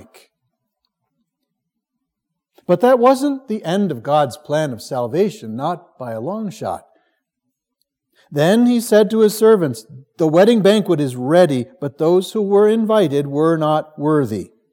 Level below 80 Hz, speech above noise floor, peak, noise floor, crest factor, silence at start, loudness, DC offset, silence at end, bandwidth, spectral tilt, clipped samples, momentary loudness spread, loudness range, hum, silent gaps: -70 dBFS; 63 dB; 0 dBFS; -78 dBFS; 16 dB; 2.7 s; -16 LUFS; under 0.1%; 0.25 s; 17 kHz; -6.5 dB/octave; under 0.1%; 13 LU; 9 LU; none; none